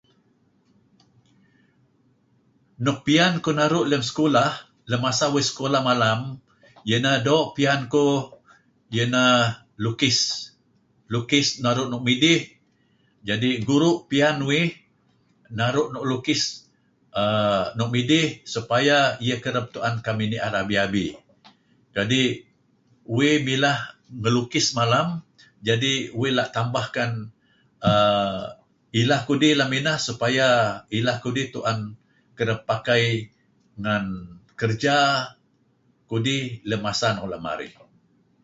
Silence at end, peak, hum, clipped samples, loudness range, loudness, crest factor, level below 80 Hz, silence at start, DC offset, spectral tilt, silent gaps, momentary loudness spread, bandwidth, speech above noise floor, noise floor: 0.75 s; -4 dBFS; none; under 0.1%; 4 LU; -22 LUFS; 20 dB; -58 dBFS; 2.8 s; under 0.1%; -4.5 dB/octave; none; 12 LU; 8 kHz; 42 dB; -64 dBFS